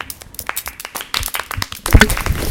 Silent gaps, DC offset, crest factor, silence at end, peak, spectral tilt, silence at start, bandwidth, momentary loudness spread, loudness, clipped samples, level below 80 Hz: none; under 0.1%; 18 dB; 0 s; 0 dBFS; -3.5 dB/octave; 0 s; 18 kHz; 15 LU; -18 LUFS; 0.5%; -22 dBFS